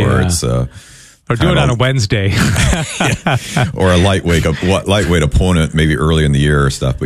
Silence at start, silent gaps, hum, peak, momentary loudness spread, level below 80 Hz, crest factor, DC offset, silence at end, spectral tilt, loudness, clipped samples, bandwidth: 0 s; none; none; 0 dBFS; 4 LU; -24 dBFS; 12 dB; under 0.1%; 0 s; -5.5 dB/octave; -13 LUFS; under 0.1%; 14 kHz